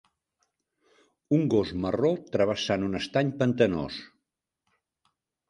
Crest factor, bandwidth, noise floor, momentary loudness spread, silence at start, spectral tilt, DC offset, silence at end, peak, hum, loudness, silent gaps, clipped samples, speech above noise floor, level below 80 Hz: 20 dB; 11 kHz; -84 dBFS; 6 LU; 1.3 s; -6.5 dB/octave; under 0.1%; 1.45 s; -8 dBFS; none; -27 LUFS; none; under 0.1%; 58 dB; -56 dBFS